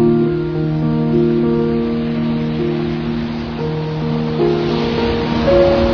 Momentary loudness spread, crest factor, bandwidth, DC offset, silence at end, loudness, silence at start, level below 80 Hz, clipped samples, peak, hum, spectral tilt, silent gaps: 7 LU; 16 dB; 5.4 kHz; under 0.1%; 0 s; -17 LUFS; 0 s; -32 dBFS; under 0.1%; 0 dBFS; none; -8.5 dB/octave; none